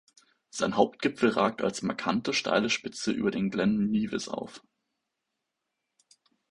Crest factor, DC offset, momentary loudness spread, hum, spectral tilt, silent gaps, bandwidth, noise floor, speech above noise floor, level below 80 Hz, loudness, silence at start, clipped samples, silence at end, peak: 24 dB; under 0.1%; 8 LU; none; -4.5 dB/octave; none; 11.5 kHz; -84 dBFS; 56 dB; -64 dBFS; -28 LUFS; 0.55 s; under 0.1%; 1.9 s; -6 dBFS